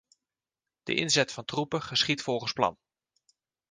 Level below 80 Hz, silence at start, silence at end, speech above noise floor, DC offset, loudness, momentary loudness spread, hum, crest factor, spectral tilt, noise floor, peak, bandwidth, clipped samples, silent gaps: -66 dBFS; 0.85 s; 0.95 s; over 61 dB; under 0.1%; -28 LUFS; 6 LU; none; 24 dB; -3 dB/octave; under -90 dBFS; -8 dBFS; 10 kHz; under 0.1%; none